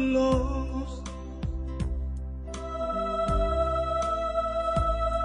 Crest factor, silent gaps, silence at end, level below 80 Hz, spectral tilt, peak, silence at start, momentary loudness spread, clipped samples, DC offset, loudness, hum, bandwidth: 16 dB; none; 0 s; -34 dBFS; -7 dB/octave; -12 dBFS; 0 s; 11 LU; under 0.1%; under 0.1%; -29 LUFS; none; 10 kHz